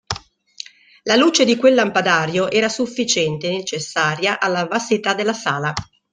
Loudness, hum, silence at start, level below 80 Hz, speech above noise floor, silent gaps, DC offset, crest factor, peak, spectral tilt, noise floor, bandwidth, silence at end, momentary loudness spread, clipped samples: -18 LUFS; none; 0.1 s; -56 dBFS; 21 dB; none; under 0.1%; 18 dB; 0 dBFS; -3.5 dB/octave; -39 dBFS; 10 kHz; 0.3 s; 15 LU; under 0.1%